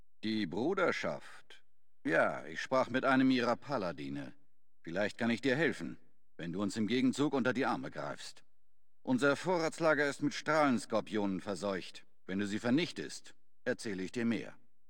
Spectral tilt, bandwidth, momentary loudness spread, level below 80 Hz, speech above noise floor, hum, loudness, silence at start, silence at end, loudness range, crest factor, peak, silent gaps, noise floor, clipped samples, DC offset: -5 dB/octave; 16.5 kHz; 15 LU; -72 dBFS; 52 dB; none; -34 LUFS; 0.25 s; 0.4 s; 4 LU; 20 dB; -16 dBFS; none; -85 dBFS; under 0.1%; 0.3%